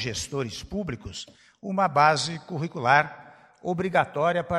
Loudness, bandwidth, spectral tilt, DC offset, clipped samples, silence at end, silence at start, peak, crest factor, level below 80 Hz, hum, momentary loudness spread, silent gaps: -25 LUFS; 13 kHz; -4.5 dB/octave; under 0.1%; under 0.1%; 0 s; 0 s; -4 dBFS; 22 dB; -54 dBFS; none; 17 LU; none